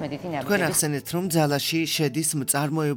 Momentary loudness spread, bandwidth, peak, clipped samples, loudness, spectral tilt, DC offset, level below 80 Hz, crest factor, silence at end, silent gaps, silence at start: 5 LU; 19.5 kHz; -8 dBFS; under 0.1%; -24 LUFS; -4 dB/octave; under 0.1%; -62 dBFS; 16 dB; 0 s; none; 0 s